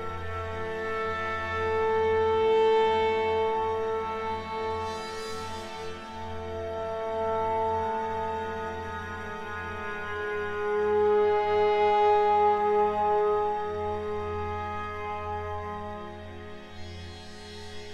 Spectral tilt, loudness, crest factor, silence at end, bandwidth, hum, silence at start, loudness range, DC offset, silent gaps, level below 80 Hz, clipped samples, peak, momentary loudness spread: -5.5 dB/octave; -28 LUFS; 14 dB; 0 s; 10 kHz; none; 0 s; 10 LU; under 0.1%; none; -52 dBFS; under 0.1%; -14 dBFS; 16 LU